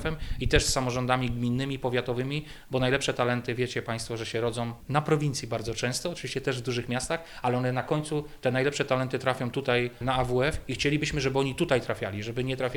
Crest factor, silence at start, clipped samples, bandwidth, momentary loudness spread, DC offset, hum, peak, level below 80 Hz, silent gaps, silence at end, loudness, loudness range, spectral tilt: 20 dB; 0 s; under 0.1%; 19.5 kHz; 6 LU; under 0.1%; none; -8 dBFS; -42 dBFS; none; 0 s; -28 LUFS; 2 LU; -5 dB/octave